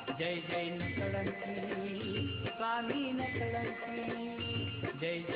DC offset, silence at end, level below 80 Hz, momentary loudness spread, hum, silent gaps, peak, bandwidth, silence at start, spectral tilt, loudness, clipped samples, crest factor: under 0.1%; 0 s; -66 dBFS; 3 LU; none; none; -22 dBFS; 5.2 kHz; 0 s; -8.5 dB/octave; -37 LUFS; under 0.1%; 14 dB